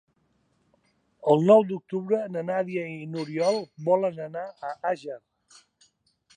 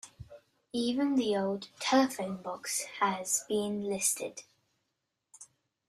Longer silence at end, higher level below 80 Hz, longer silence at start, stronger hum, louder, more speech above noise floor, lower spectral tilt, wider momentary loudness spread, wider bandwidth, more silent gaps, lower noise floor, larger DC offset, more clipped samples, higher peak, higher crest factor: first, 1.2 s vs 0.45 s; second, -78 dBFS vs -70 dBFS; first, 1.25 s vs 0.05 s; neither; first, -26 LUFS vs -31 LUFS; second, 44 dB vs 52 dB; first, -7 dB/octave vs -3 dB/octave; first, 16 LU vs 11 LU; second, 9.6 kHz vs 15.5 kHz; neither; second, -69 dBFS vs -83 dBFS; neither; neither; first, -6 dBFS vs -14 dBFS; about the same, 22 dB vs 20 dB